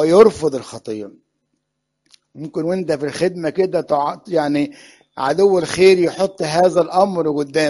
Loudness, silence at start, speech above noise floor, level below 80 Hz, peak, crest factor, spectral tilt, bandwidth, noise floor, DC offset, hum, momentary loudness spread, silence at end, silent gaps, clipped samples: -17 LUFS; 0 s; 58 dB; -56 dBFS; 0 dBFS; 16 dB; -5.5 dB/octave; 11.5 kHz; -74 dBFS; under 0.1%; none; 16 LU; 0 s; none; under 0.1%